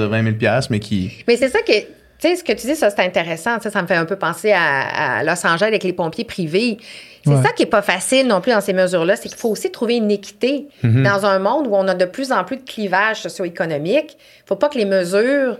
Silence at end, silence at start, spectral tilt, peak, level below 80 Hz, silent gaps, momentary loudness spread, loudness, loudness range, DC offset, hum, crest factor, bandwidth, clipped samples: 0 s; 0 s; -5 dB/octave; 0 dBFS; -56 dBFS; none; 7 LU; -18 LUFS; 2 LU; under 0.1%; none; 16 dB; 15.5 kHz; under 0.1%